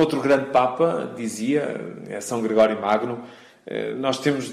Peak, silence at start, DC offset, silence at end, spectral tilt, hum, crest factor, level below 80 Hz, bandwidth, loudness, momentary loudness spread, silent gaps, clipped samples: -8 dBFS; 0 s; under 0.1%; 0 s; -5 dB/octave; none; 14 dB; -66 dBFS; 14 kHz; -23 LUFS; 13 LU; none; under 0.1%